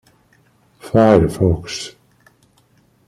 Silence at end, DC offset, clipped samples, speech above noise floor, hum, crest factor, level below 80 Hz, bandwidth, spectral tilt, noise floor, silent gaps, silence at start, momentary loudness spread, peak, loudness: 1.15 s; under 0.1%; under 0.1%; 42 dB; none; 18 dB; -40 dBFS; 14.5 kHz; -7 dB/octave; -56 dBFS; none; 0.85 s; 16 LU; -2 dBFS; -16 LUFS